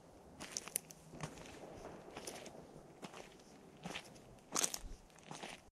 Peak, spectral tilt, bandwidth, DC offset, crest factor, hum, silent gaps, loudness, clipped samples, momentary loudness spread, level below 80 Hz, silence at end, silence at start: -14 dBFS; -2 dB/octave; 15 kHz; under 0.1%; 36 dB; none; none; -46 LUFS; under 0.1%; 19 LU; -64 dBFS; 0 s; 0 s